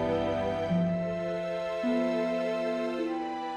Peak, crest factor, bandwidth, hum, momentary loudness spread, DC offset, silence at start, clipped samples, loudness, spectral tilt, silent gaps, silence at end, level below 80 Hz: -18 dBFS; 12 dB; 9.8 kHz; none; 4 LU; under 0.1%; 0 s; under 0.1%; -30 LUFS; -7.5 dB/octave; none; 0 s; -56 dBFS